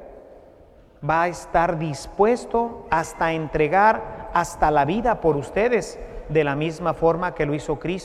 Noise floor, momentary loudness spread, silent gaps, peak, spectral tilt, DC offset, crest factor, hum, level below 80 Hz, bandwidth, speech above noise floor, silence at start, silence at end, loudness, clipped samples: -50 dBFS; 7 LU; none; -4 dBFS; -6 dB/octave; under 0.1%; 18 dB; none; -42 dBFS; 13.5 kHz; 28 dB; 0 s; 0 s; -22 LUFS; under 0.1%